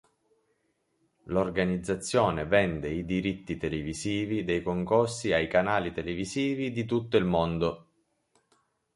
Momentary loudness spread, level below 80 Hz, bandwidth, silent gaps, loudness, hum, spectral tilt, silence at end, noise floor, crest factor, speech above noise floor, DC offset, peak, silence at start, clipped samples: 7 LU; -50 dBFS; 11.5 kHz; none; -28 LUFS; none; -5.5 dB/octave; 1.15 s; -74 dBFS; 20 dB; 46 dB; under 0.1%; -10 dBFS; 1.25 s; under 0.1%